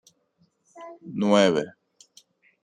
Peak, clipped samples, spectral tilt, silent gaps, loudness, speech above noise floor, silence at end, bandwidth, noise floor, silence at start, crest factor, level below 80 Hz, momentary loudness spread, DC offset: -6 dBFS; under 0.1%; -5.5 dB/octave; none; -22 LUFS; 45 dB; 0.95 s; 10 kHz; -68 dBFS; 0.75 s; 20 dB; -70 dBFS; 25 LU; under 0.1%